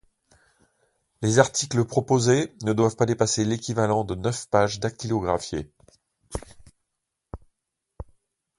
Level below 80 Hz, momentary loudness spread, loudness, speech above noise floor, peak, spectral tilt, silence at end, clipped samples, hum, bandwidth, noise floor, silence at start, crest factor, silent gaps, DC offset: -50 dBFS; 24 LU; -24 LUFS; 58 dB; 0 dBFS; -5 dB/octave; 0.55 s; under 0.1%; none; 11.5 kHz; -81 dBFS; 1.2 s; 24 dB; none; under 0.1%